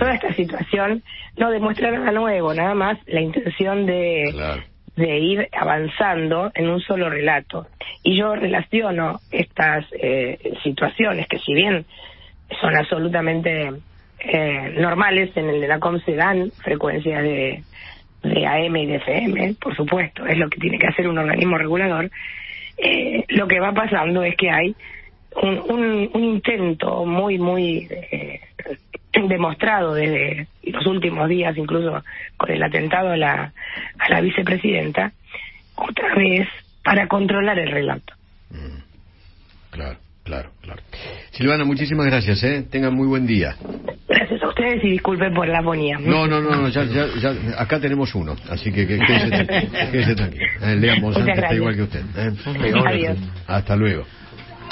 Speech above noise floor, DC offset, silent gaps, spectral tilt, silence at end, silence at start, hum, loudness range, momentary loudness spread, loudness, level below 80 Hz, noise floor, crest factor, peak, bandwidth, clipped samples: 28 dB; under 0.1%; none; -10.5 dB/octave; 0 s; 0 s; none; 3 LU; 14 LU; -20 LUFS; -42 dBFS; -48 dBFS; 20 dB; 0 dBFS; 5.8 kHz; under 0.1%